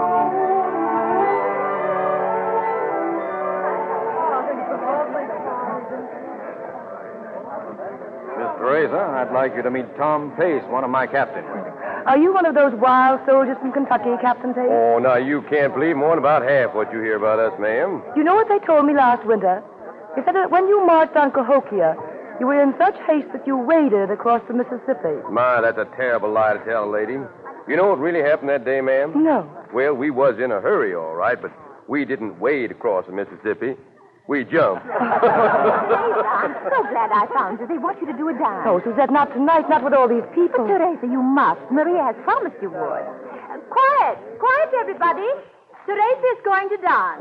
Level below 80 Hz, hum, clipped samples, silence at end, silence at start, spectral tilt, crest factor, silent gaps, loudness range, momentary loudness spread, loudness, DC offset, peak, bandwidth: -70 dBFS; none; under 0.1%; 0 s; 0 s; -8.5 dB/octave; 14 dB; none; 6 LU; 12 LU; -19 LUFS; under 0.1%; -6 dBFS; 5.2 kHz